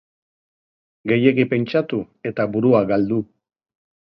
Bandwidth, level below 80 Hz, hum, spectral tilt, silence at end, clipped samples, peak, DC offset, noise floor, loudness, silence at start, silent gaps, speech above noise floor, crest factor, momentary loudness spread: 6 kHz; -58 dBFS; none; -10 dB/octave; 0.8 s; under 0.1%; -2 dBFS; under 0.1%; under -90 dBFS; -19 LUFS; 1.05 s; none; over 71 dB; 20 dB; 11 LU